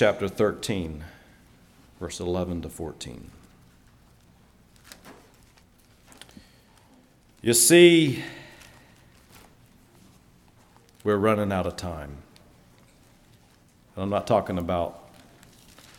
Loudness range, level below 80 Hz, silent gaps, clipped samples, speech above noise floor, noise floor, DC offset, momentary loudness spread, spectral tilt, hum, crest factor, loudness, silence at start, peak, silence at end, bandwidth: 14 LU; -54 dBFS; none; under 0.1%; 35 dB; -58 dBFS; under 0.1%; 28 LU; -4 dB/octave; none; 24 dB; -23 LUFS; 0 s; -4 dBFS; 1 s; 18 kHz